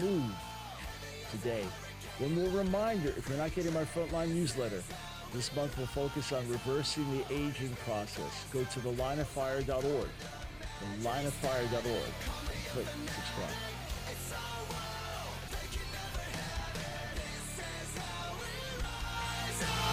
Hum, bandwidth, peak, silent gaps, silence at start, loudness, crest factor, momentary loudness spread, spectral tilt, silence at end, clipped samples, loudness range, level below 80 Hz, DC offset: none; 16 kHz; -20 dBFS; none; 0 s; -37 LUFS; 16 dB; 8 LU; -4.5 dB/octave; 0 s; under 0.1%; 5 LU; -48 dBFS; under 0.1%